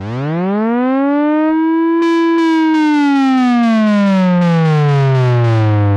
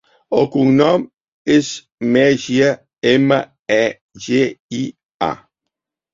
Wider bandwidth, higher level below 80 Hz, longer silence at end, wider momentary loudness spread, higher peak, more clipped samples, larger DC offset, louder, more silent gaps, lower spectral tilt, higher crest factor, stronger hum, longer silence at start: first, 9 kHz vs 7.6 kHz; about the same, -52 dBFS vs -56 dBFS; second, 0 s vs 0.75 s; second, 3 LU vs 13 LU; about the same, -4 dBFS vs -2 dBFS; neither; neither; first, -12 LUFS vs -17 LUFS; second, none vs 1.28-1.45 s, 1.94-1.98 s, 3.59-3.65 s, 4.01-4.09 s, 4.60-4.69 s, 5.14-5.20 s; first, -8.5 dB/octave vs -5.5 dB/octave; second, 8 dB vs 16 dB; neither; second, 0 s vs 0.3 s